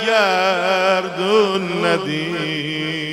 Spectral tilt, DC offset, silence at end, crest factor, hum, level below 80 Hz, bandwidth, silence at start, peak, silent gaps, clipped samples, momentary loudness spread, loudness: -4.5 dB/octave; under 0.1%; 0 s; 16 dB; none; -58 dBFS; 16 kHz; 0 s; -2 dBFS; none; under 0.1%; 6 LU; -18 LUFS